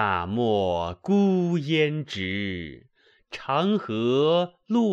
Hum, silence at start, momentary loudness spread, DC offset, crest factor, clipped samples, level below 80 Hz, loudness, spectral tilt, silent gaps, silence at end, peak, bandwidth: none; 0 s; 10 LU; under 0.1%; 16 dB; under 0.1%; -56 dBFS; -24 LUFS; -7 dB/octave; none; 0 s; -8 dBFS; 7.8 kHz